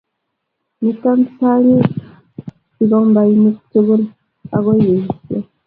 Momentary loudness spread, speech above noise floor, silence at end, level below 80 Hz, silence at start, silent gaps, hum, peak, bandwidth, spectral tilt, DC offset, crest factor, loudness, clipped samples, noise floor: 14 LU; 61 dB; 0.25 s; -54 dBFS; 0.8 s; none; none; 0 dBFS; 4 kHz; -13 dB/octave; under 0.1%; 14 dB; -14 LUFS; under 0.1%; -73 dBFS